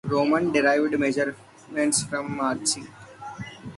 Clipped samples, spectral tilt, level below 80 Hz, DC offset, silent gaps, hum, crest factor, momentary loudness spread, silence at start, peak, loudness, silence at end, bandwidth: under 0.1%; -3.5 dB/octave; -62 dBFS; under 0.1%; none; none; 16 dB; 17 LU; 0.05 s; -8 dBFS; -24 LUFS; 0 s; 11.5 kHz